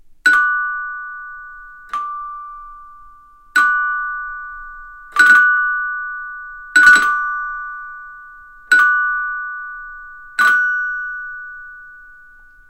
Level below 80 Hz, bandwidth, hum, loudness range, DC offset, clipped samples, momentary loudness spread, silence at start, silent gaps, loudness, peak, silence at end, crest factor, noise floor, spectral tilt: -50 dBFS; 16.5 kHz; none; 8 LU; under 0.1%; under 0.1%; 24 LU; 0.1 s; none; -15 LUFS; 0 dBFS; 0.65 s; 18 dB; -44 dBFS; 0.5 dB/octave